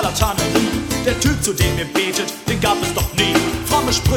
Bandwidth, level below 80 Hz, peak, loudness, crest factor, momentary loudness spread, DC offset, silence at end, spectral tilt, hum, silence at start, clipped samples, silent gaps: 19 kHz; -28 dBFS; -2 dBFS; -18 LUFS; 16 dB; 4 LU; under 0.1%; 0 s; -4 dB/octave; none; 0 s; under 0.1%; none